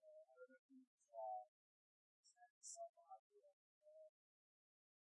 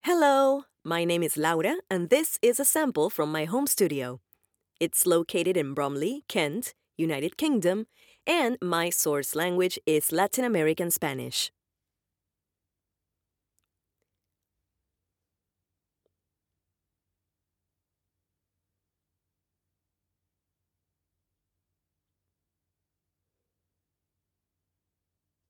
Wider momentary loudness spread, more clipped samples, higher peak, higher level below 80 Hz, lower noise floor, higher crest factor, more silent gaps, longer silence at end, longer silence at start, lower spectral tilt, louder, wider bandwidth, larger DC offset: first, 15 LU vs 9 LU; neither; second, -44 dBFS vs -10 dBFS; second, under -90 dBFS vs -78 dBFS; about the same, under -90 dBFS vs -87 dBFS; about the same, 18 dB vs 20 dB; first, 0.59-0.69 s, 0.87-0.98 s, 1.48-2.24 s, 2.50-2.61 s, 2.89-2.94 s, 3.19-3.30 s, 3.53-3.81 s vs none; second, 1.05 s vs 14 s; about the same, 0 s vs 0.05 s; second, 0.5 dB/octave vs -3.5 dB/octave; second, -59 LUFS vs -26 LUFS; second, 8.8 kHz vs over 20 kHz; neither